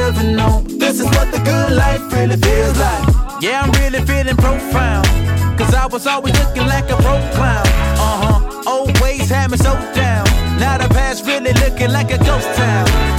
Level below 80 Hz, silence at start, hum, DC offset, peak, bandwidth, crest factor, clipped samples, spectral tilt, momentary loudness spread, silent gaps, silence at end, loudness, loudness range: -18 dBFS; 0 s; none; under 0.1%; 0 dBFS; 17 kHz; 12 dB; under 0.1%; -5.5 dB/octave; 3 LU; none; 0 s; -14 LUFS; 1 LU